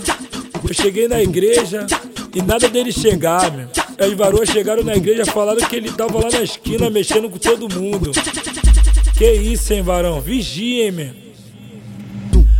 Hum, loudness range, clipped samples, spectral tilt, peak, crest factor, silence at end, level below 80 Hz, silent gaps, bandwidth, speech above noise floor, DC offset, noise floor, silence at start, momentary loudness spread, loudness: none; 2 LU; under 0.1%; -4.5 dB/octave; 0 dBFS; 14 dB; 0 s; -20 dBFS; none; 17 kHz; 22 dB; under 0.1%; -37 dBFS; 0 s; 8 LU; -16 LUFS